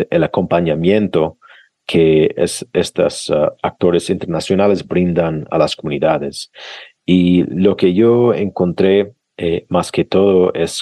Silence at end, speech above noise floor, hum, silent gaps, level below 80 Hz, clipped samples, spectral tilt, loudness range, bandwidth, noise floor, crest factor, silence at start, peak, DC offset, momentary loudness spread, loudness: 0 s; 32 dB; none; none; -46 dBFS; under 0.1%; -6 dB/octave; 2 LU; 12.5 kHz; -46 dBFS; 14 dB; 0 s; -2 dBFS; under 0.1%; 8 LU; -15 LUFS